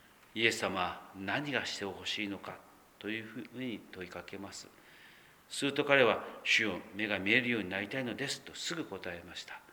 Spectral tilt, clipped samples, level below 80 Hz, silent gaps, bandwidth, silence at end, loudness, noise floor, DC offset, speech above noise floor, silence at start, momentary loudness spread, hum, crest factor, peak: -3.5 dB/octave; under 0.1%; -74 dBFS; none; over 20 kHz; 0 s; -33 LUFS; -59 dBFS; under 0.1%; 24 dB; 0.35 s; 17 LU; none; 26 dB; -10 dBFS